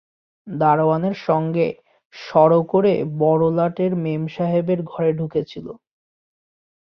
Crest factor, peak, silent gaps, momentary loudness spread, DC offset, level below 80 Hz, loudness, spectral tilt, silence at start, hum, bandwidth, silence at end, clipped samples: 18 dB; -2 dBFS; 2.05-2.10 s; 15 LU; under 0.1%; -60 dBFS; -19 LUFS; -9.5 dB/octave; 0.45 s; none; 6.2 kHz; 1.05 s; under 0.1%